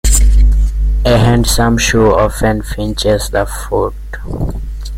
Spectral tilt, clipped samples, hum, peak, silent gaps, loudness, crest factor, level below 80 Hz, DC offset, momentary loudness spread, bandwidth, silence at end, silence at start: -5 dB/octave; under 0.1%; none; 0 dBFS; none; -13 LUFS; 12 dB; -14 dBFS; under 0.1%; 11 LU; 16 kHz; 0 s; 0.05 s